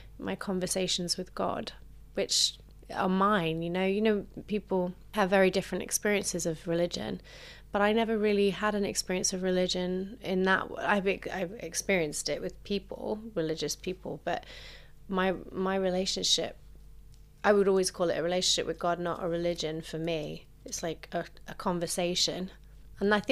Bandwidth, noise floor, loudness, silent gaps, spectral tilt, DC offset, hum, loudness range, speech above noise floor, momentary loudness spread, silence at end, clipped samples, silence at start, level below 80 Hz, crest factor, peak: 15.5 kHz; -52 dBFS; -30 LUFS; none; -3.5 dB/octave; under 0.1%; none; 5 LU; 22 dB; 11 LU; 0 s; under 0.1%; 0 s; -54 dBFS; 20 dB; -10 dBFS